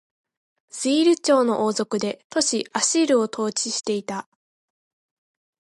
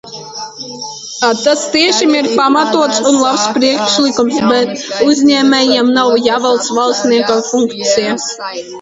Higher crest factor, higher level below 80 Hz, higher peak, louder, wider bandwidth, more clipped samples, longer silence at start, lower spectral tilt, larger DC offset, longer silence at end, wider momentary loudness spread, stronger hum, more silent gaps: first, 18 dB vs 12 dB; second, -72 dBFS vs -56 dBFS; second, -6 dBFS vs 0 dBFS; second, -22 LUFS vs -11 LUFS; first, 11.5 kHz vs 8 kHz; neither; first, 0.75 s vs 0.05 s; about the same, -3 dB/octave vs -2.5 dB/octave; neither; first, 1.4 s vs 0 s; second, 9 LU vs 14 LU; neither; first, 2.24-2.30 s vs none